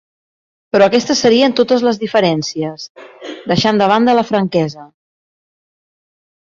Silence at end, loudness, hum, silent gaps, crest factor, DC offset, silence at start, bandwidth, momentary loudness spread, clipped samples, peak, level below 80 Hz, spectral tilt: 1.7 s; -14 LUFS; none; 2.90-2.95 s; 14 dB; under 0.1%; 0.75 s; 7.6 kHz; 16 LU; under 0.1%; 0 dBFS; -54 dBFS; -5 dB/octave